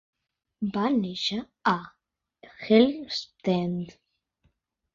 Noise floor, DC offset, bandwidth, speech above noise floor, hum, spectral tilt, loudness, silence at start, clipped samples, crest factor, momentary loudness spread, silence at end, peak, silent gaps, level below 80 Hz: -71 dBFS; under 0.1%; 7.6 kHz; 45 dB; none; -6 dB/octave; -26 LUFS; 0.6 s; under 0.1%; 22 dB; 14 LU; 1.05 s; -6 dBFS; none; -66 dBFS